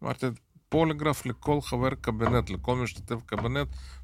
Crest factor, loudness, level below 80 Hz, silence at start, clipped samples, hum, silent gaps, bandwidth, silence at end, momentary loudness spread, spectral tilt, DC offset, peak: 18 dB; -29 LUFS; -44 dBFS; 0 s; under 0.1%; none; none; 15.5 kHz; 0 s; 7 LU; -6.5 dB/octave; under 0.1%; -10 dBFS